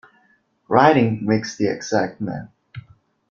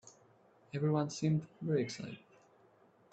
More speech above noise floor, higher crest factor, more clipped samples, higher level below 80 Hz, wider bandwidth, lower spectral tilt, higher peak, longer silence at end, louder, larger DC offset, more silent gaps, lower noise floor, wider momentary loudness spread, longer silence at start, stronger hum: first, 43 dB vs 31 dB; about the same, 20 dB vs 18 dB; neither; first, -58 dBFS vs -76 dBFS; second, 7.4 kHz vs 8.2 kHz; about the same, -6 dB/octave vs -6.5 dB/octave; first, -2 dBFS vs -20 dBFS; second, 0.5 s vs 0.95 s; first, -19 LUFS vs -36 LUFS; neither; neither; second, -61 dBFS vs -66 dBFS; first, 26 LU vs 13 LU; first, 0.7 s vs 0.05 s; neither